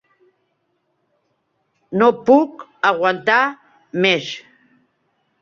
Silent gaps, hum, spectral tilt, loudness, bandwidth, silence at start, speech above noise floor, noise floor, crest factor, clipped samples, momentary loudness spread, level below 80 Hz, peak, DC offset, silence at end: none; none; -5 dB/octave; -17 LUFS; 7.2 kHz; 1.9 s; 53 dB; -69 dBFS; 20 dB; under 0.1%; 13 LU; -66 dBFS; -2 dBFS; under 0.1%; 1 s